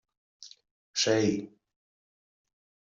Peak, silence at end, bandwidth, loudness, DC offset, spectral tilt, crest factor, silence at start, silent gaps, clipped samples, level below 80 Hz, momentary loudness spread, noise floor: -12 dBFS; 1.5 s; 8 kHz; -28 LUFS; under 0.1%; -3.5 dB/octave; 22 dB; 0.4 s; 0.71-0.94 s; under 0.1%; -72 dBFS; 25 LU; under -90 dBFS